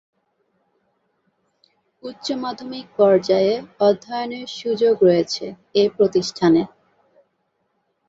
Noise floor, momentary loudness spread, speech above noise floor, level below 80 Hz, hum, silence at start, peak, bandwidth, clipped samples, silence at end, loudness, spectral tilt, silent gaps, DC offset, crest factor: -70 dBFS; 15 LU; 51 dB; -64 dBFS; none; 2.05 s; -2 dBFS; 7.8 kHz; under 0.1%; 1.4 s; -19 LUFS; -5.5 dB/octave; none; under 0.1%; 18 dB